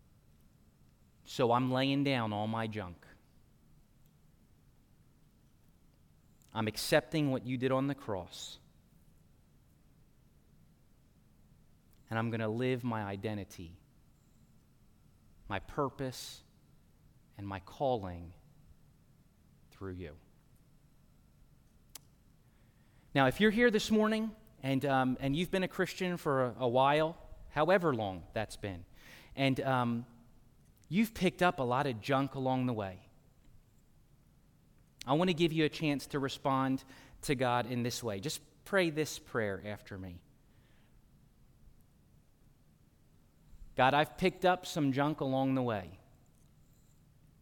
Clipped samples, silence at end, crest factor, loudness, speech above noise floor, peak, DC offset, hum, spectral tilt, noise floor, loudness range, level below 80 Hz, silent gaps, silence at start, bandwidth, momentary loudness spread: under 0.1%; 1.45 s; 22 dB; -33 LUFS; 32 dB; -14 dBFS; under 0.1%; none; -5.5 dB/octave; -65 dBFS; 13 LU; -62 dBFS; none; 1.25 s; 17.5 kHz; 18 LU